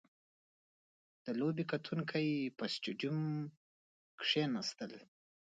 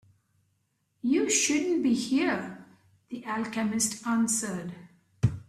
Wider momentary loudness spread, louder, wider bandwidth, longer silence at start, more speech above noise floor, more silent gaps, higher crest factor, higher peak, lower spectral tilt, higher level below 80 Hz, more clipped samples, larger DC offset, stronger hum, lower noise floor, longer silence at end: about the same, 14 LU vs 14 LU; second, -38 LUFS vs -27 LUFS; second, 9 kHz vs 15 kHz; first, 1.25 s vs 1.05 s; first, over 52 dB vs 47 dB; first, 3.57-4.18 s vs none; about the same, 20 dB vs 18 dB; second, -20 dBFS vs -10 dBFS; first, -5.5 dB/octave vs -4 dB/octave; second, -84 dBFS vs -56 dBFS; neither; neither; neither; first, under -90 dBFS vs -74 dBFS; first, 0.45 s vs 0.05 s